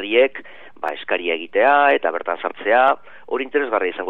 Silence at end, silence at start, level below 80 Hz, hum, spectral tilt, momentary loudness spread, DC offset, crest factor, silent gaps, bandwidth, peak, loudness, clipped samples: 0 s; 0 s; -72 dBFS; none; -5 dB/octave; 13 LU; 0.9%; 18 dB; none; 4.4 kHz; -2 dBFS; -19 LUFS; under 0.1%